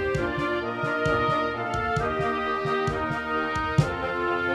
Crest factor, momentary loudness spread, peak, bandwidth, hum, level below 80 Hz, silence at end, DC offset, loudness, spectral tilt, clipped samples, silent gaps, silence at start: 18 dB; 4 LU; -8 dBFS; 12.5 kHz; none; -44 dBFS; 0 s; under 0.1%; -26 LUFS; -6.5 dB/octave; under 0.1%; none; 0 s